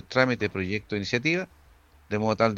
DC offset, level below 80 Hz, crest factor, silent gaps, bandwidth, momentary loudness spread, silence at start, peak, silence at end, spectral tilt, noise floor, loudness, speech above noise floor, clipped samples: under 0.1%; -58 dBFS; 22 dB; none; 8.2 kHz; 7 LU; 0.1 s; -4 dBFS; 0 s; -5.5 dB/octave; -56 dBFS; -27 LUFS; 31 dB; under 0.1%